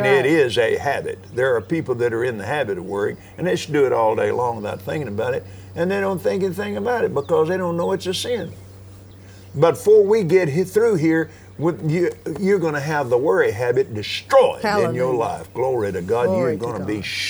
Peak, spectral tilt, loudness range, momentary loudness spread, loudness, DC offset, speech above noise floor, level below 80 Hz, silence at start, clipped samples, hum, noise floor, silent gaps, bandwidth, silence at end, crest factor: -2 dBFS; -6 dB/octave; 4 LU; 9 LU; -20 LUFS; under 0.1%; 22 dB; -56 dBFS; 0 s; under 0.1%; none; -42 dBFS; none; over 20 kHz; 0 s; 18 dB